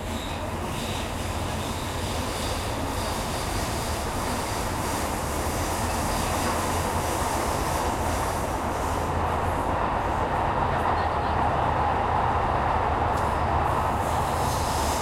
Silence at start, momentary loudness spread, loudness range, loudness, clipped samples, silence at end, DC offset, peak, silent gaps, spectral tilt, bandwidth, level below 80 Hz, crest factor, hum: 0 s; 5 LU; 4 LU; -26 LUFS; under 0.1%; 0 s; under 0.1%; -12 dBFS; none; -4.5 dB/octave; 16.5 kHz; -36 dBFS; 14 dB; none